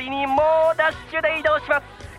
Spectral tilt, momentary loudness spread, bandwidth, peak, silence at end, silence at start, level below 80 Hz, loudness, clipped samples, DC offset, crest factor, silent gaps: -5 dB/octave; 6 LU; 11.5 kHz; -6 dBFS; 0 s; 0 s; -48 dBFS; -20 LUFS; under 0.1%; under 0.1%; 16 dB; none